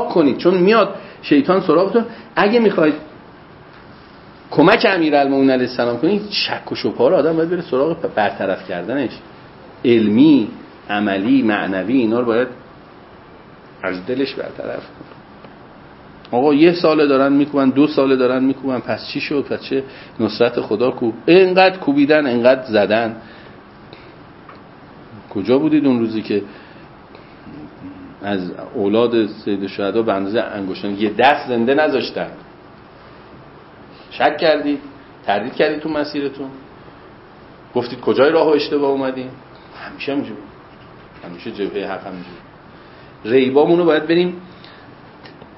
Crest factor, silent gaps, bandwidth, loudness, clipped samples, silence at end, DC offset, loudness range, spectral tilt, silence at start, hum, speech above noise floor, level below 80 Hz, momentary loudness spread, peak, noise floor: 18 dB; none; 5.8 kHz; -16 LUFS; under 0.1%; 0.25 s; under 0.1%; 8 LU; -9 dB/octave; 0 s; none; 25 dB; -56 dBFS; 16 LU; 0 dBFS; -41 dBFS